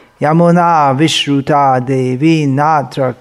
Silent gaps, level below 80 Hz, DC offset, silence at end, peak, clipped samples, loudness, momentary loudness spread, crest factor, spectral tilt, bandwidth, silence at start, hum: none; -54 dBFS; under 0.1%; 0.05 s; 0 dBFS; under 0.1%; -11 LUFS; 5 LU; 10 dB; -6 dB/octave; 12.5 kHz; 0.2 s; none